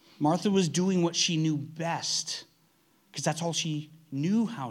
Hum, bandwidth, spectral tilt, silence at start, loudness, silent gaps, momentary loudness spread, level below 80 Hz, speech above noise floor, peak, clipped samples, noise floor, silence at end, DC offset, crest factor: none; 13.5 kHz; -4.5 dB/octave; 0.2 s; -28 LUFS; none; 11 LU; -78 dBFS; 38 dB; -12 dBFS; under 0.1%; -66 dBFS; 0 s; under 0.1%; 16 dB